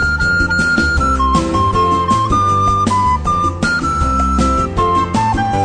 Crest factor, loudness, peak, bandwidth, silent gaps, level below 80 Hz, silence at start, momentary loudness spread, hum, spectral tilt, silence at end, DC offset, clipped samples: 12 dB; -14 LUFS; 0 dBFS; 10.5 kHz; none; -24 dBFS; 0 s; 2 LU; none; -5.5 dB/octave; 0 s; under 0.1%; under 0.1%